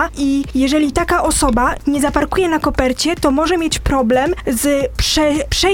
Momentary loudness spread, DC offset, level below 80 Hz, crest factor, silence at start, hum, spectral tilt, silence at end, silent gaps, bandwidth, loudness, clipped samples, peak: 3 LU; under 0.1%; -28 dBFS; 16 dB; 0 s; none; -4 dB/octave; 0 s; none; 17.5 kHz; -15 LUFS; under 0.1%; 0 dBFS